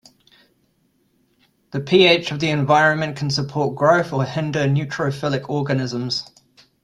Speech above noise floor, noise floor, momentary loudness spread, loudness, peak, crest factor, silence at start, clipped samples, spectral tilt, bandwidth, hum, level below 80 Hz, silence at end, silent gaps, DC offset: 45 dB; -64 dBFS; 9 LU; -19 LUFS; -2 dBFS; 20 dB; 1.75 s; under 0.1%; -5.5 dB/octave; 11 kHz; none; -58 dBFS; 0.6 s; none; under 0.1%